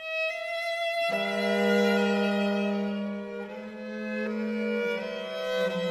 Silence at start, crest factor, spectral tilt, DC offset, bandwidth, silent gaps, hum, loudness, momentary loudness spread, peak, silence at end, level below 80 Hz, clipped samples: 0 s; 16 dB; -5.5 dB/octave; under 0.1%; 15 kHz; none; none; -28 LUFS; 12 LU; -14 dBFS; 0 s; -72 dBFS; under 0.1%